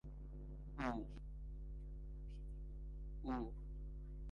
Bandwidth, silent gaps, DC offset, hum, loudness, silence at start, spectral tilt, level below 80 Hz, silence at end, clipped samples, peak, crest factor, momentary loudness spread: 7 kHz; none; under 0.1%; none; -50 LUFS; 0.05 s; -8 dB/octave; -50 dBFS; 0 s; under 0.1%; -28 dBFS; 20 dB; 9 LU